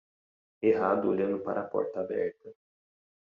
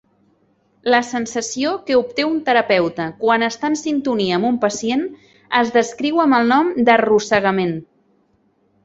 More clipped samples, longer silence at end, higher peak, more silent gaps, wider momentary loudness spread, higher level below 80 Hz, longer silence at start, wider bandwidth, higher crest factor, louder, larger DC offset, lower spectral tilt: neither; second, 0.75 s vs 1 s; second, -12 dBFS vs -2 dBFS; neither; about the same, 6 LU vs 8 LU; second, -74 dBFS vs -60 dBFS; second, 0.6 s vs 0.85 s; second, 5.6 kHz vs 8.2 kHz; about the same, 18 dB vs 16 dB; second, -30 LUFS vs -17 LUFS; neither; first, -7 dB/octave vs -4.5 dB/octave